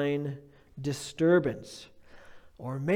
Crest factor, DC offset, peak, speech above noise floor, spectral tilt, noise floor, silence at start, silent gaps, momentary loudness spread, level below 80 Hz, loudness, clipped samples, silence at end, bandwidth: 18 dB; under 0.1%; -12 dBFS; 21 dB; -6.5 dB/octave; -50 dBFS; 0 s; none; 21 LU; -62 dBFS; -30 LUFS; under 0.1%; 0 s; 15 kHz